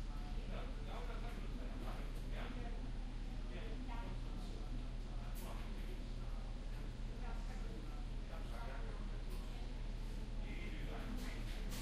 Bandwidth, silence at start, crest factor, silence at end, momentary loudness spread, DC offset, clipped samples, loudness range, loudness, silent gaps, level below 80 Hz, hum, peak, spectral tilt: 14.5 kHz; 0 s; 12 dB; 0 s; 2 LU; under 0.1%; under 0.1%; 1 LU; -49 LUFS; none; -44 dBFS; none; -32 dBFS; -6 dB/octave